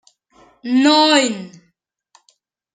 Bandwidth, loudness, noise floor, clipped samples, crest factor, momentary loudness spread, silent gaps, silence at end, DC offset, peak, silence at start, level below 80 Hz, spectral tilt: 9.4 kHz; -14 LUFS; -66 dBFS; under 0.1%; 18 dB; 19 LU; none; 1.25 s; under 0.1%; -2 dBFS; 0.65 s; -74 dBFS; -2.5 dB/octave